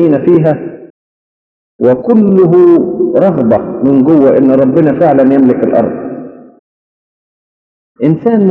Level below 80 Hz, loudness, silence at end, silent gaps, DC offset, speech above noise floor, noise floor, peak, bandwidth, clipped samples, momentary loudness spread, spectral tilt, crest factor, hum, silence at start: -50 dBFS; -8 LUFS; 0 s; 0.90-1.79 s, 6.59-7.95 s; under 0.1%; over 83 dB; under -90 dBFS; 0 dBFS; 4.1 kHz; 1%; 9 LU; -11.5 dB/octave; 10 dB; none; 0 s